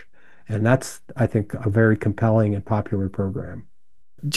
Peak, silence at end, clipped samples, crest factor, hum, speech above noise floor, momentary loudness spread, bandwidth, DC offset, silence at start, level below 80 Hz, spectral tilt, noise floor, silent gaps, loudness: -2 dBFS; 0 s; under 0.1%; 20 dB; none; 49 dB; 14 LU; 12.5 kHz; 0.9%; 0.5 s; -52 dBFS; -7 dB/octave; -70 dBFS; none; -22 LUFS